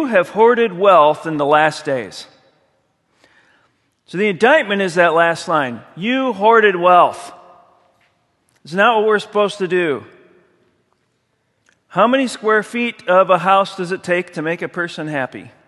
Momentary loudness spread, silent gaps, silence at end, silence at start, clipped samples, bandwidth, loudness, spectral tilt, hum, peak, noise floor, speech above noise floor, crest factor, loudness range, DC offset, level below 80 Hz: 12 LU; none; 0.2 s; 0 s; under 0.1%; 12 kHz; -15 LUFS; -5 dB/octave; none; 0 dBFS; -66 dBFS; 51 dB; 16 dB; 6 LU; under 0.1%; -68 dBFS